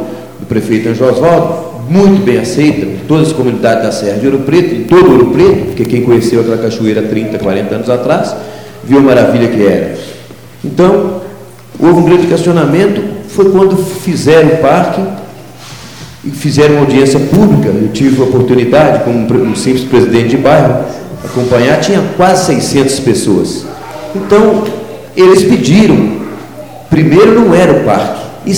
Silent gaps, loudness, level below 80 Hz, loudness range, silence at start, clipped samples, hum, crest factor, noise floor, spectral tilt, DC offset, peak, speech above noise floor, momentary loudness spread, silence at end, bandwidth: none; -8 LUFS; -38 dBFS; 2 LU; 0 s; 2%; none; 8 dB; -29 dBFS; -6.5 dB/octave; 0.7%; 0 dBFS; 22 dB; 15 LU; 0 s; 19 kHz